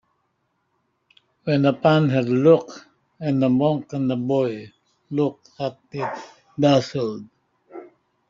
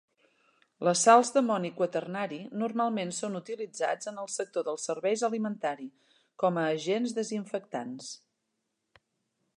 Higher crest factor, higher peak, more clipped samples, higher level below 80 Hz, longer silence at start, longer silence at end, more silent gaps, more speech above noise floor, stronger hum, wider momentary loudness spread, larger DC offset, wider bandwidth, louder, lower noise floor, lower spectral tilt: about the same, 20 dB vs 22 dB; first, -4 dBFS vs -8 dBFS; neither; first, -62 dBFS vs -86 dBFS; first, 1.45 s vs 0.8 s; second, 0.45 s vs 1.4 s; neither; about the same, 51 dB vs 52 dB; neither; first, 20 LU vs 14 LU; neither; second, 7.6 kHz vs 11.5 kHz; first, -21 LUFS vs -30 LUFS; second, -71 dBFS vs -81 dBFS; first, -6.5 dB/octave vs -4 dB/octave